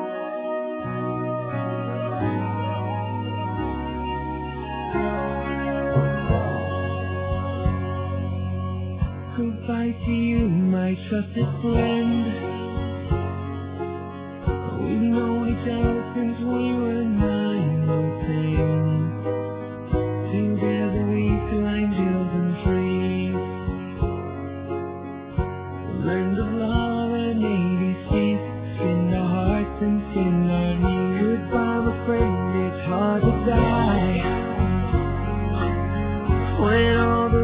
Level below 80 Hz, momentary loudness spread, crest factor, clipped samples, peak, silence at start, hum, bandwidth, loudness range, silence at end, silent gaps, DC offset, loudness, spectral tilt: -34 dBFS; 8 LU; 16 dB; under 0.1%; -6 dBFS; 0 s; none; 4 kHz; 5 LU; 0 s; none; under 0.1%; -24 LUFS; -12 dB/octave